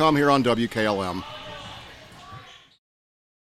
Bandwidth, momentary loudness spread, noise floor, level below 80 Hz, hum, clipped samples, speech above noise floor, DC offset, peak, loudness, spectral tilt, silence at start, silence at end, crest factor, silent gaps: 14.5 kHz; 24 LU; -45 dBFS; -54 dBFS; none; under 0.1%; 23 dB; under 0.1%; -6 dBFS; -22 LUFS; -5.5 dB/octave; 0 s; 0.9 s; 18 dB; none